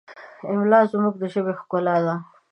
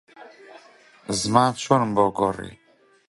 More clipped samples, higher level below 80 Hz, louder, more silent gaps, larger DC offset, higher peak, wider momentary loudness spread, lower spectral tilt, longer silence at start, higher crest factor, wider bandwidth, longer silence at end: neither; second, -76 dBFS vs -56 dBFS; about the same, -22 LUFS vs -21 LUFS; neither; neither; about the same, -2 dBFS vs -2 dBFS; second, 10 LU vs 17 LU; first, -9 dB/octave vs -5 dB/octave; about the same, 0.1 s vs 0.2 s; about the same, 20 dB vs 22 dB; second, 8.6 kHz vs 11.5 kHz; second, 0.3 s vs 0.55 s